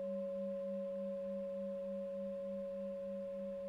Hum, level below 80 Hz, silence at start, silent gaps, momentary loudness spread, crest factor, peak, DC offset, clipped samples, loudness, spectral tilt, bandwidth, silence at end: none; -74 dBFS; 0 s; none; 2 LU; 8 dB; -34 dBFS; under 0.1%; under 0.1%; -43 LUFS; -9 dB/octave; 5.4 kHz; 0 s